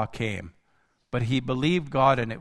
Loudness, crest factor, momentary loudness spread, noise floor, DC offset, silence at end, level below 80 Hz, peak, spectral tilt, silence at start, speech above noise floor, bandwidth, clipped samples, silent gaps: -25 LUFS; 18 dB; 10 LU; -68 dBFS; under 0.1%; 0 s; -50 dBFS; -8 dBFS; -6.5 dB/octave; 0 s; 43 dB; 11 kHz; under 0.1%; none